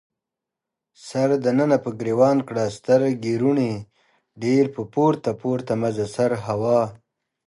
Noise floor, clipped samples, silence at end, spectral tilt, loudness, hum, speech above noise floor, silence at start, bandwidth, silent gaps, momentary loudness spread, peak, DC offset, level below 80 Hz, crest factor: -86 dBFS; under 0.1%; 0.5 s; -7 dB/octave; -22 LUFS; none; 65 dB; 1.05 s; 11.5 kHz; none; 7 LU; -4 dBFS; under 0.1%; -62 dBFS; 18 dB